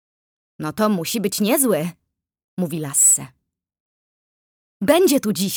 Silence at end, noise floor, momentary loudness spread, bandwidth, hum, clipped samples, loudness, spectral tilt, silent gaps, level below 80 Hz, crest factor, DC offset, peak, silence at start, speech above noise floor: 0 s; under -90 dBFS; 16 LU; over 20 kHz; none; under 0.1%; -18 LUFS; -3.5 dB/octave; 2.44-2.57 s, 3.80-4.80 s; -62 dBFS; 18 dB; under 0.1%; -2 dBFS; 0.6 s; over 71 dB